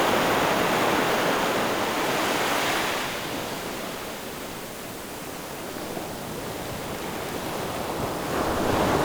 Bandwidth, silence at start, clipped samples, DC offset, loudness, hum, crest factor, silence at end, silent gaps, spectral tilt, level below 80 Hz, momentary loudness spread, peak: over 20 kHz; 0 s; under 0.1%; under 0.1%; -26 LUFS; none; 18 dB; 0 s; none; -3.5 dB/octave; -48 dBFS; 12 LU; -8 dBFS